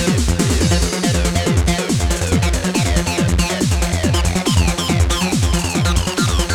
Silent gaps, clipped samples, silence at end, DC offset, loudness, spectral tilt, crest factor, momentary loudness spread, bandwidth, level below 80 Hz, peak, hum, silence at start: none; under 0.1%; 0 s; under 0.1%; -17 LUFS; -4.5 dB/octave; 14 dB; 2 LU; 18 kHz; -22 dBFS; -2 dBFS; none; 0 s